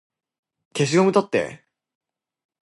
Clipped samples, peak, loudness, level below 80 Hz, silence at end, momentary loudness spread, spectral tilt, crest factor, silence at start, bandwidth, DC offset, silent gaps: under 0.1%; -4 dBFS; -20 LUFS; -66 dBFS; 1.05 s; 15 LU; -5.5 dB/octave; 20 dB; 0.75 s; 11.5 kHz; under 0.1%; none